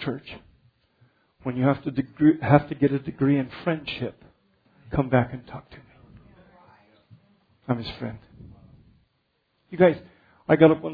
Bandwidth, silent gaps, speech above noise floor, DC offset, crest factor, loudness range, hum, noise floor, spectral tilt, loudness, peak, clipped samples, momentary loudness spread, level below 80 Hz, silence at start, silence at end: 5 kHz; none; 49 dB; under 0.1%; 24 dB; 14 LU; none; -72 dBFS; -10.5 dB/octave; -24 LUFS; -2 dBFS; under 0.1%; 23 LU; -54 dBFS; 0 s; 0 s